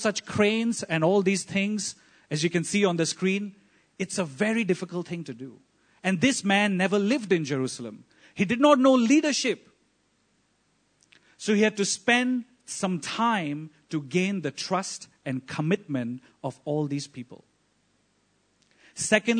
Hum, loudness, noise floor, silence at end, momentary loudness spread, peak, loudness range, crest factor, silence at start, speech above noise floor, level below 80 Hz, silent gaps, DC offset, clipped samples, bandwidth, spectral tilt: none; -26 LUFS; -69 dBFS; 0 s; 14 LU; -4 dBFS; 8 LU; 22 dB; 0 s; 44 dB; -70 dBFS; none; under 0.1%; under 0.1%; 9.6 kHz; -4.5 dB/octave